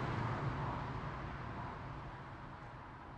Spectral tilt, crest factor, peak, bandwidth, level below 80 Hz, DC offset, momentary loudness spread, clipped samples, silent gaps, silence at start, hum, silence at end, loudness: -7.5 dB/octave; 16 dB; -28 dBFS; 8.8 kHz; -54 dBFS; under 0.1%; 11 LU; under 0.1%; none; 0 s; none; 0 s; -44 LUFS